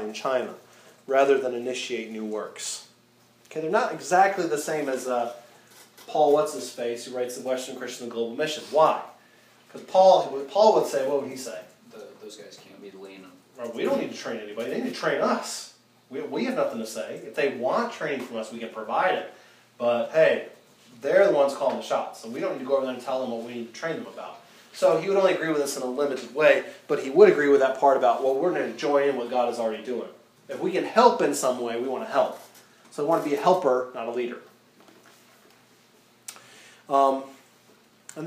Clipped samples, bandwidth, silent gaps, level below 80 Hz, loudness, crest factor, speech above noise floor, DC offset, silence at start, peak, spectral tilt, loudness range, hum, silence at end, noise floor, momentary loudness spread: under 0.1%; 15.5 kHz; none; -86 dBFS; -25 LUFS; 24 dB; 35 dB; under 0.1%; 0 s; -2 dBFS; -4 dB/octave; 9 LU; none; 0 s; -59 dBFS; 20 LU